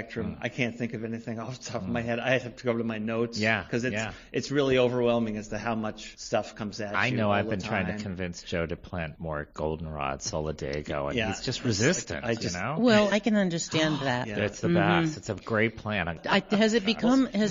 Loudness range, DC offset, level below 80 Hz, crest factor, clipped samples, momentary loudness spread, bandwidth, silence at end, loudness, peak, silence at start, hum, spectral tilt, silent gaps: 6 LU; under 0.1%; -50 dBFS; 20 dB; under 0.1%; 11 LU; 7.6 kHz; 0 s; -28 LUFS; -8 dBFS; 0 s; none; -5 dB/octave; none